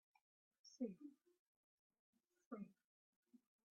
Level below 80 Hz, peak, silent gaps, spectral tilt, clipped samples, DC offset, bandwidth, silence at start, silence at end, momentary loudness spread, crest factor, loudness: under -90 dBFS; -36 dBFS; 1.39-1.90 s, 1.99-2.13 s, 2.46-2.51 s, 2.84-3.23 s; -7 dB/octave; under 0.1%; under 0.1%; 6.8 kHz; 0.65 s; 0.35 s; 12 LU; 24 dB; -55 LUFS